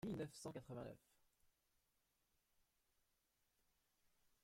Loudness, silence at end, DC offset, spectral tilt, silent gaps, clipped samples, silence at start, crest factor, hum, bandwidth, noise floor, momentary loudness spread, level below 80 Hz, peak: -53 LUFS; 3 s; under 0.1%; -6 dB/octave; none; under 0.1%; 0.05 s; 20 dB; none; 16 kHz; -86 dBFS; 10 LU; -80 dBFS; -38 dBFS